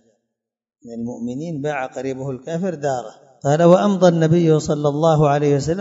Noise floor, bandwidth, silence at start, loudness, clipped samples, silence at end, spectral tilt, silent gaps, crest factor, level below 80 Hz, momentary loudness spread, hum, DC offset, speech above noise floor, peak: -84 dBFS; 7.8 kHz; 0.85 s; -18 LUFS; under 0.1%; 0 s; -7 dB/octave; none; 18 dB; -52 dBFS; 14 LU; none; under 0.1%; 66 dB; 0 dBFS